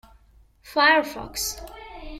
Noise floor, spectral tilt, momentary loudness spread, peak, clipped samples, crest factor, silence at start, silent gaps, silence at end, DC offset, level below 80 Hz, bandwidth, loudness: -55 dBFS; -1.5 dB/octave; 22 LU; -6 dBFS; under 0.1%; 20 dB; 0.65 s; none; 0 s; under 0.1%; -46 dBFS; 16.5 kHz; -22 LUFS